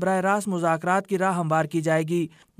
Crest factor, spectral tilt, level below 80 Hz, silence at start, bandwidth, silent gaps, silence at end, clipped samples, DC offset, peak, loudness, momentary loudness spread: 14 dB; -6 dB/octave; -70 dBFS; 0 s; 15.5 kHz; none; 0.3 s; under 0.1%; under 0.1%; -10 dBFS; -24 LUFS; 2 LU